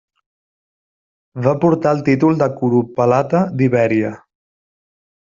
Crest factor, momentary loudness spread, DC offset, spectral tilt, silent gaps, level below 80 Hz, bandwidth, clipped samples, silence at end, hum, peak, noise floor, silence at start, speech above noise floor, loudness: 16 dB; 5 LU; under 0.1%; -9 dB/octave; none; -56 dBFS; 7.4 kHz; under 0.1%; 1.1 s; none; -2 dBFS; under -90 dBFS; 1.35 s; over 75 dB; -16 LUFS